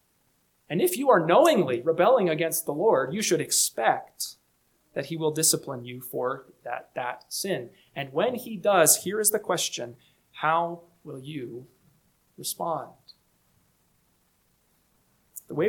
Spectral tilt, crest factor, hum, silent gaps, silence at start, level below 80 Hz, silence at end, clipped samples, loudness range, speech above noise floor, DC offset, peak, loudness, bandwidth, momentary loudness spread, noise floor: -3 dB/octave; 22 dB; none; none; 0.7 s; -74 dBFS; 0 s; under 0.1%; 15 LU; 43 dB; under 0.1%; -4 dBFS; -25 LUFS; 19 kHz; 18 LU; -69 dBFS